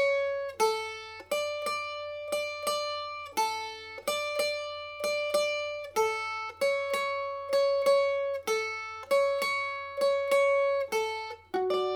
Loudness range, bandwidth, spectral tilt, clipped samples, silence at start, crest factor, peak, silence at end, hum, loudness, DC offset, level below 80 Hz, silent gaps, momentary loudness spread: 4 LU; 18.5 kHz; -1.5 dB/octave; under 0.1%; 0 s; 16 dB; -14 dBFS; 0 s; none; -30 LUFS; under 0.1%; -70 dBFS; none; 10 LU